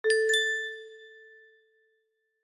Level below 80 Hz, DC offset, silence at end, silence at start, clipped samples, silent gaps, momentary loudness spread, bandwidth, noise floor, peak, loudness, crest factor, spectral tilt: -80 dBFS; under 0.1%; 1.35 s; 0.05 s; under 0.1%; none; 25 LU; 15 kHz; -76 dBFS; -12 dBFS; -26 LUFS; 20 dB; 2 dB/octave